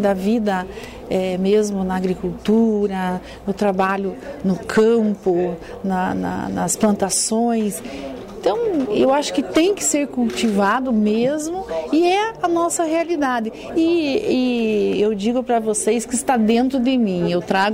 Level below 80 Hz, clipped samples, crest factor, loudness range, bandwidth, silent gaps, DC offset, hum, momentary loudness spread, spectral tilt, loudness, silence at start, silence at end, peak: -48 dBFS; under 0.1%; 12 dB; 2 LU; 16 kHz; none; under 0.1%; none; 8 LU; -4.5 dB/octave; -19 LUFS; 0 s; 0 s; -6 dBFS